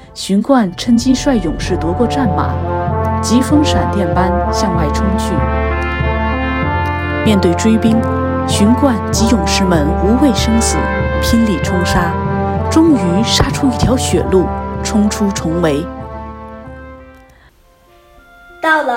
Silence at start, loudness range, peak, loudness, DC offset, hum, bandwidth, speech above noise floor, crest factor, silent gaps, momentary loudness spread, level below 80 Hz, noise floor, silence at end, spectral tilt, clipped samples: 0 s; 5 LU; 0 dBFS; -14 LUFS; under 0.1%; none; 16.5 kHz; 35 dB; 14 dB; none; 6 LU; -24 dBFS; -47 dBFS; 0 s; -5.5 dB/octave; under 0.1%